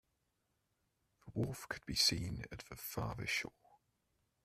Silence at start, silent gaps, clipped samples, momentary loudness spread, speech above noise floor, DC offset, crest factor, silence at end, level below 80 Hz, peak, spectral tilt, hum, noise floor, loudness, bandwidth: 1.25 s; none; under 0.1%; 15 LU; 43 dB; under 0.1%; 24 dB; 0.95 s; -62 dBFS; -20 dBFS; -3 dB/octave; none; -83 dBFS; -38 LUFS; 15.5 kHz